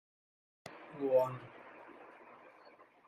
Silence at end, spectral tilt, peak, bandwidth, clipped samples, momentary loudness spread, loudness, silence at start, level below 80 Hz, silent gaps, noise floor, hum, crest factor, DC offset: 0.6 s; -7.5 dB/octave; -18 dBFS; 13 kHz; under 0.1%; 25 LU; -35 LUFS; 0.65 s; -84 dBFS; none; -62 dBFS; none; 22 dB; under 0.1%